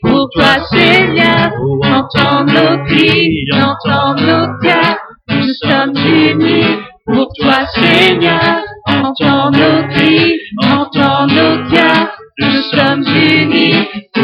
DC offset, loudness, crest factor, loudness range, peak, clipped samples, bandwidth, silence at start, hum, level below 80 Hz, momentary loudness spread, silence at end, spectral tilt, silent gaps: under 0.1%; -10 LUFS; 10 dB; 2 LU; 0 dBFS; under 0.1%; 10 kHz; 0 s; none; -40 dBFS; 6 LU; 0 s; -6.5 dB/octave; none